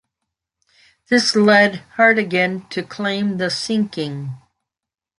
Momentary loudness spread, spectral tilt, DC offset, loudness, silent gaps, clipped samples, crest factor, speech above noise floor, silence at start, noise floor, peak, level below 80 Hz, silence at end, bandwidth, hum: 14 LU; -4.5 dB/octave; under 0.1%; -17 LUFS; none; under 0.1%; 18 dB; 70 dB; 1.1 s; -87 dBFS; -2 dBFS; -64 dBFS; 0.8 s; 11.5 kHz; none